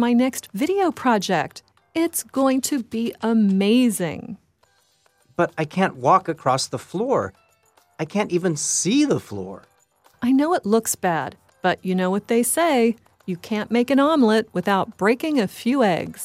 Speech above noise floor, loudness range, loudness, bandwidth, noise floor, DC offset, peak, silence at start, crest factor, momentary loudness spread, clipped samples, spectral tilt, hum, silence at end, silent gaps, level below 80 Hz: 42 dB; 3 LU; -21 LUFS; 16 kHz; -62 dBFS; under 0.1%; -4 dBFS; 0 s; 18 dB; 12 LU; under 0.1%; -4.5 dB/octave; none; 0 s; none; -64 dBFS